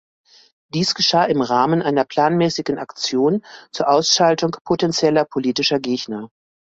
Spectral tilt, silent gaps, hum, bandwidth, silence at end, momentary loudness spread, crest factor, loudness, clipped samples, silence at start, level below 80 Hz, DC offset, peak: -4 dB/octave; 4.61-4.65 s; none; 8 kHz; 0.4 s; 10 LU; 16 dB; -18 LUFS; under 0.1%; 0.75 s; -60 dBFS; under 0.1%; -2 dBFS